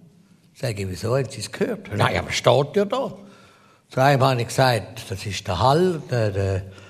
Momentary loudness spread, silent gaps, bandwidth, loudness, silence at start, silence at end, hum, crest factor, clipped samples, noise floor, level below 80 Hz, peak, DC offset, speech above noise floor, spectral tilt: 11 LU; none; 14.5 kHz; -22 LUFS; 0.6 s; 0 s; none; 20 dB; under 0.1%; -54 dBFS; -52 dBFS; -2 dBFS; under 0.1%; 32 dB; -5.5 dB/octave